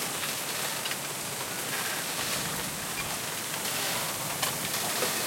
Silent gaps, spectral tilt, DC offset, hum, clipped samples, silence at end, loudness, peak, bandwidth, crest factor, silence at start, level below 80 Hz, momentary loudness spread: none; -1 dB/octave; under 0.1%; none; under 0.1%; 0 s; -30 LUFS; -10 dBFS; 16.5 kHz; 22 dB; 0 s; -62 dBFS; 3 LU